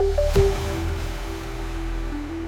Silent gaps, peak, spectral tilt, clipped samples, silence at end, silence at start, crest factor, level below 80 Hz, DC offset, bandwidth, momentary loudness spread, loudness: none; -4 dBFS; -6 dB/octave; under 0.1%; 0 s; 0 s; 18 dB; -28 dBFS; under 0.1%; 16.5 kHz; 11 LU; -26 LUFS